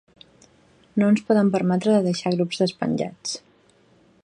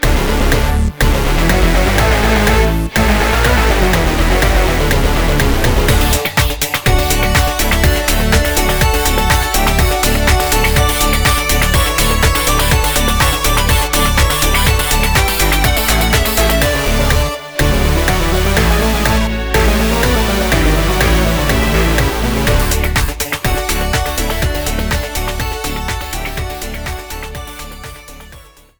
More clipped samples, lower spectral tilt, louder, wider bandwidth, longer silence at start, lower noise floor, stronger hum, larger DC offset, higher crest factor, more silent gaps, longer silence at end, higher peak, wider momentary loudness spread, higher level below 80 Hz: neither; first, -6 dB/octave vs -4 dB/octave; second, -22 LUFS vs -13 LUFS; second, 10.5 kHz vs over 20 kHz; first, 0.95 s vs 0 s; first, -58 dBFS vs -39 dBFS; neither; second, under 0.1% vs 1%; about the same, 16 dB vs 12 dB; neither; first, 0.85 s vs 0.35 s; second, -6 dBFS vs 0 dBFS; first, 11 LU vs 8 LU; second, -66 dBFS vs -16 dBFS